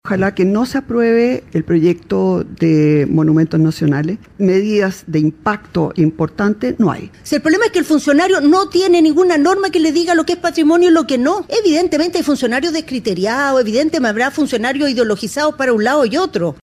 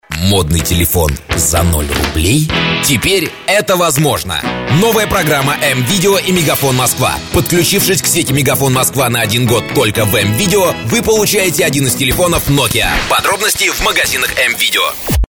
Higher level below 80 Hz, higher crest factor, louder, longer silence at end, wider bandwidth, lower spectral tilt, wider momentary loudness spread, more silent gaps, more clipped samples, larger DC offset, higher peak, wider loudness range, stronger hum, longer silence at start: second, -48 dBFS vs -26 dBFS; about the same, 10 dB vs 12 dB; second, -14 LUFS vs -11 LUFS; about the same, 0.1 s vs 0.05 s; second, 15 kHz vs over 20 kHz; first, -6 dB/octave vs -3.5 dB/octave; first, 6 LU vs 3 LU; neither; neither; neither; about the same, -2 dBFS vs 0 dBFS; first, 4 LU vs 1 LU; neither; about the same, 0.05 s vs 0.1 s